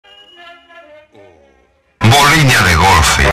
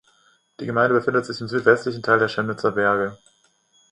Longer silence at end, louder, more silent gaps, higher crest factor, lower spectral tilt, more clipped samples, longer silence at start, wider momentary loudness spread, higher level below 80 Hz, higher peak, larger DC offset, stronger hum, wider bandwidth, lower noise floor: second, 0 s vs 0.75 s; first, -8 LUFS vs -21 LUFS; neither; second, 12 dB vs 22 dB; second, -3.5 dB/octave vs -6 dB/octave; neither; first, 2 s vs 0.6 s; second, 3 LU vs 8 LU; first, -26 dBFS vs -62 dBFS; about the same, 0 dBFS vs 0 dBFS; neither; neither; first, 15.5 kHz vs 10.5 kHz; second, -53 dBFS vs -62 dBFS